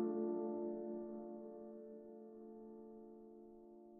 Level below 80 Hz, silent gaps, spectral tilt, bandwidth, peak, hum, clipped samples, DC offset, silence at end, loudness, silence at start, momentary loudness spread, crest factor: -82 dBFS; none; -8 dB/octave; 1.9 kHz; -30 dBFS; none; under 0.1%; under 0.1%; 0 s; -48 LUFS; 0 s; 17 LU; 18 dB